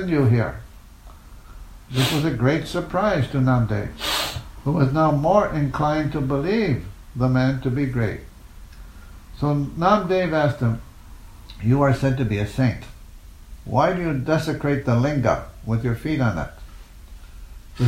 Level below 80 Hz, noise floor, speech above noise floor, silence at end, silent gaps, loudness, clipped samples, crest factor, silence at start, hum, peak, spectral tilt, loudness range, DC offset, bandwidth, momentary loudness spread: -40 dBFS; -43 dBFS; 23 dB; 0 s; none; -22 LUFS; under 0.1%; 18 dB; 0 s; none; -4 dBFS; -7 dB/octave; 3 LU; under 0.1%; 16 kHz; 9 LU